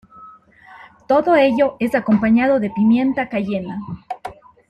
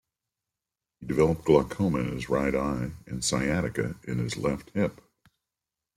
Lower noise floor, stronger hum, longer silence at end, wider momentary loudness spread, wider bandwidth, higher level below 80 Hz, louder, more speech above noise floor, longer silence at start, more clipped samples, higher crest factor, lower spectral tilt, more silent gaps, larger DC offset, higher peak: second, -45 dBFS vs -89 dBFS; neither; second, 0.4 s vs 1.05 s; first, 16 LU vs 9 LU; second, 11.5 kHz vs 16 kHz; about the same, -52 dBFS vs -48 dBFS; first, -17 LUFS vs -28 LUFS; second, 28 dB vs 62 dB; second, 0.2 s vs 1 s; neither; second, 14 dB vs 20 dB; first, -8 dB/octave vs -5.5 dB/octave; neither; neither; first, -4 dBFS vs -8 dBFS